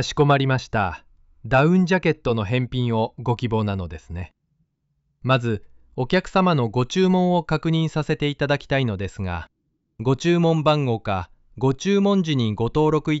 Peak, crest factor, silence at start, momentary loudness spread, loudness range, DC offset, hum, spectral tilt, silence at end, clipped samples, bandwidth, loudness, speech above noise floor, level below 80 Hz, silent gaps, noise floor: -6 dBFS; 14 dB; 0 s; 12 LU; 4 LU; under 0.1%; none; -5.5 dB/octave; 0 s; under 0.1%; 8 kHz; -21 LUFS; 50 dB; -46 dBFS; none; -71 dBFS